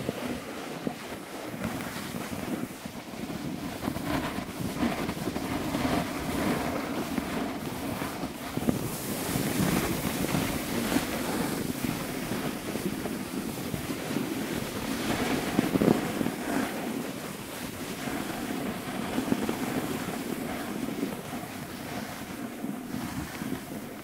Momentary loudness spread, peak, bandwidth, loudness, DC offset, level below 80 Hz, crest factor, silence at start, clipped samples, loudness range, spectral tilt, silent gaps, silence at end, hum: 8 LU; -6 dBFS; 16 kHz; -32 LUFS; under 0.1%; -52 dBFS; 26 dB; 0 s; under 0.1%; 6 LU; -4.5 dB/octave; none; 0 s; none